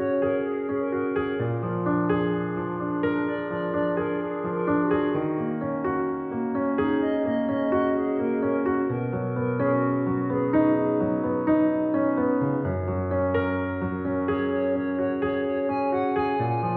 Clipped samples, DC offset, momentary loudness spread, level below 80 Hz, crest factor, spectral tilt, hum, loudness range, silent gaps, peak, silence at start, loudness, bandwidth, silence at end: under 0.1%; under 0.1%; 5 LU; -56 dBFS; 14 dB; -7.5 dB/octave; none; 3 LU; none; -10 dBFS; 0 s; -25 LUFS; 4.4 kHz; 0 s